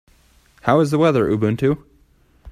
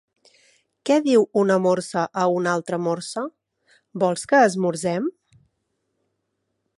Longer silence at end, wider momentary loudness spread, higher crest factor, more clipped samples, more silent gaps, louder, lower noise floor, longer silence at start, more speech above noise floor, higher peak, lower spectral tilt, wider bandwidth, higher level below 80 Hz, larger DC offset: second, 0 s vs 1.7 s; second, 8 LU vs 13 LU; about the same, 18 dB vs 18 dB; neither; neither; first, -18 LUFS vs -21 LUFS; second, -55 dBFS vs -76 dBFS; second, 0.65 s vs 0.85 s; second, 39 dB vs 55 dB; first, -2 dBFS vs -6 dBFS; first, -7.5 dB/octave vs -5.5 dB/octave; first, 14 kHz vs 11.5 kHz; first, -50 dBFS vs -70 dBFS; neither